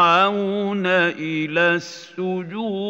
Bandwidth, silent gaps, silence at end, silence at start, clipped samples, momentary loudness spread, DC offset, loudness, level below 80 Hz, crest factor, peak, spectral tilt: 8 kHz; none; 0 s; 0 s; under 0.1%; 9 LU; under 0.1%; -20 LUFS; -78 dBFS; 16 dB; -4 dBFS; -5.5 dB/octave